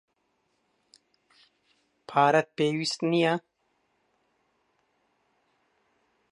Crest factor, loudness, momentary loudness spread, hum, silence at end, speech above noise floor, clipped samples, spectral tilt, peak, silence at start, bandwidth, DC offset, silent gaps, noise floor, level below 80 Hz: 22 dB; -26 LUFS; 7 LU; none; 2.95 s; 50 dB; under 0.1%; -5 dB/octave; -8 dBFS; 2.1 s; 11.5 kHz; under 0.1%; none; -74 dBFS; -82 dBFS